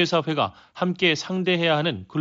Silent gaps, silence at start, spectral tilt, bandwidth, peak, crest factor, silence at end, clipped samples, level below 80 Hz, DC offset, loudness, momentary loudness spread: none; 0 s; -3.5 dB/octave; 7.6 kHz; -8 dBFS; 16 dB; 0 s; under 0.1%; -64 dBFS; under 0.1%; -23 LUFS; 7 LU